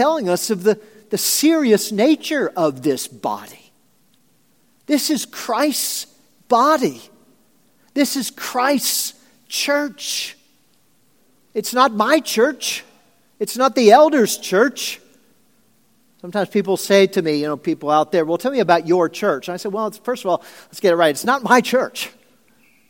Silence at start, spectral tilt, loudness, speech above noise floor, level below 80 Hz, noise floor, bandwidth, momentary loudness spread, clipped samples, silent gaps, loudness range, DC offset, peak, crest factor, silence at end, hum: 0 s; -3.5 dB/octave; -18 LUFS; 43 dB; -74 dBFS; -60 dBFS; 17 kHz; 12 LU; under 0.1%; none; 5 LU; under 0.1%; 0 dBFS; 20 dB; 0.8 s; none